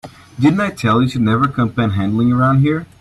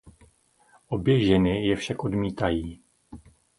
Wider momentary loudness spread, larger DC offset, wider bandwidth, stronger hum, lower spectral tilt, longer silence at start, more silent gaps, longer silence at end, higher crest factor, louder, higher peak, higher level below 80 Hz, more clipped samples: second, 4 LU vs 11 LU; neither; about the same, 12 kHz vs 11.5 kHz; neither; about the same, -8 dB/octave vs -7 dB/octave; about the same, 0.05 s vs 0.05 s; neither; second, 0.15 s vs 0.4 s; second, 14 dB vs 20 dB; first, -15 LUFS vs -25 LUFS; first, -2 dBFS vs -8 dBFS; about the same, -46 dBFS vs -46 dBFS; neither